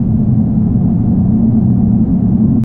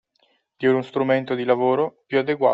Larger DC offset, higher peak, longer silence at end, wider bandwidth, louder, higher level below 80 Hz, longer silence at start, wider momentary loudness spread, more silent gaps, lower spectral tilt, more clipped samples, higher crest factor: neither; first, -2 dBFS vs -6 dBFS; about the same, 0 s vs 0 s; second, 1.8 kHz vs 5.4 kHz; first, -12 LUFS vs -22 LUFS; first, -26 dBFS vs -70 dBFS; second, 0 s vs 0.6 s; second, 1 LU vs 4 LU; neither; first, -14.5 dB/octave vs -8 dB/octave; neither; second, 8 dB vs 16 dB